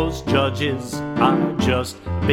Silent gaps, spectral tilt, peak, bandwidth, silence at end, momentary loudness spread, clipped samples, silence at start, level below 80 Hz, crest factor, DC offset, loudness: none; -6 dB/octave; -2 dBFS; 16 kHz; 0 s; 8 LU; under 0.1%; 0 s; -38 dBFS; 18 dB; under 0.1%; -21 LUFS